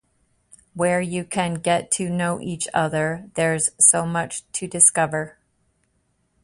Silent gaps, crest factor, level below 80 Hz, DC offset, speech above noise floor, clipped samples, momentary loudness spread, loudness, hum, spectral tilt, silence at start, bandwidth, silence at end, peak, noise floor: none; 22 dB; -58 dBFS; under 0.1%; 47 dB; under 0.1%; 13 LU; -20 LUFS; none; -3.5 dB/octave; 0.75 s; 11.5 kHz; 1.15 s; 0 dBFS; -68 dBFS